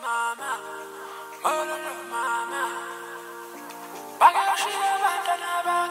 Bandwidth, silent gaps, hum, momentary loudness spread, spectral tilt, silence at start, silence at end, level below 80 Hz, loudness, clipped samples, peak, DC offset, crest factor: 16 kHz; none; none; 19 LU; -0.5 dB/octave; 0 s; 0 s; under -90 dBFS; -25 LUFS; under 0.1%; -4 dBFS; under 0.1%; 22 dB